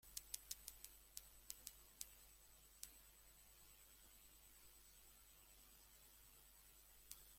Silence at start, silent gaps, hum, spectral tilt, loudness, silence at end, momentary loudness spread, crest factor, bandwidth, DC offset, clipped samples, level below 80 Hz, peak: 0 s; none; none; 0 dB/octave; -60 LUFS; 0 s; 13 LU; 38 dB; 16.5 kHz; under 0.1%; under 0.1%; -74 dBFS; -24 dBFS